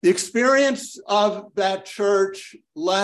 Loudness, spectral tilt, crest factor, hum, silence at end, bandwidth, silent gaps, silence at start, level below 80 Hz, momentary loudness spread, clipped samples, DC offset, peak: -21 LUFS; -3.5 dB/octave; 14 dB; none; 0 s; 12.5 kHz; none; 0.05 s; -72 dBFS; 11 LU; under 0.1%; under 0.1%; -6 dBFS